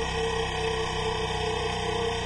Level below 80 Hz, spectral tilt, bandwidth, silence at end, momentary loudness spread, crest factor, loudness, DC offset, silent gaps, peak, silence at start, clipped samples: -40 dBFS; -4 dB/octave; 11.5 kHz; 0 s; 1 LU; 12 dB; -28 LUFS; under 0.1%; none; -16 dBFS; 0 s; under 0.1%